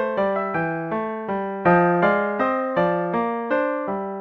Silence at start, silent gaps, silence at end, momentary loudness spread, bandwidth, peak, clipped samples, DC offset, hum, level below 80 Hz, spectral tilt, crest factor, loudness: 0 s; none; 0 s; 9 LU; 6.2 kHz; -6 dBFS; under 0.1%; under 0.1%; none; -56 dBFS; -9 dB/octave; 16 dB; -22 LUFS